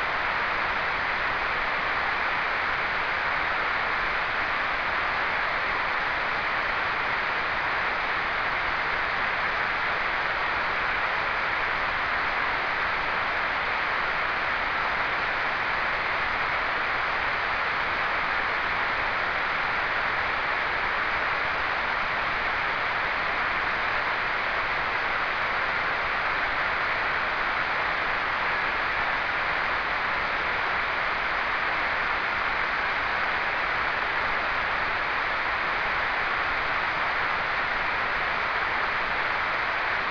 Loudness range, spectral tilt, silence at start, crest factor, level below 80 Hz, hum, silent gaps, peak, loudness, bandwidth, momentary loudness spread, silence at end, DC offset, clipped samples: 0 LU; -4 dB/octave; 0 s; 16 dB; -48 dBFS; none; none; -10 dBFS; -25 LUFS; 5.4 kHz; 1 LU; 0 s; under 0.1%; under 0.1%